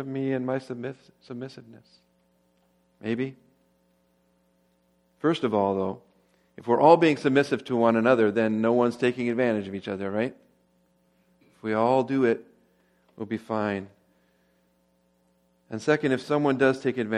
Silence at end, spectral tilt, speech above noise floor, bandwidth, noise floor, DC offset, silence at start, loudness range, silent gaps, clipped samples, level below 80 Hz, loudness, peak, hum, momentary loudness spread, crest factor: 0 s; -7 dB/octave; 43 dB; 11.5 kHz; -67 dBFS; under 0.1%; 0 s; 16 LU; none; under 0.1%; -72 dBFS; -25 LUFS; -4 dBFS; none; 17 LU; 24 dB